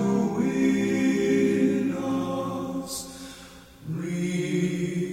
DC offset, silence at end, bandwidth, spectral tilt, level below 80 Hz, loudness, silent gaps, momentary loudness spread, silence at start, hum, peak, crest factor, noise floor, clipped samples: under 0.1%; 0 s; 16 kHz; -6 dB/octave; -56 dBFS; -26 LUFS; none; 17 LU; 0 s; none; -10 dBFS; 14 dB; -46 dBFS; under 0.1%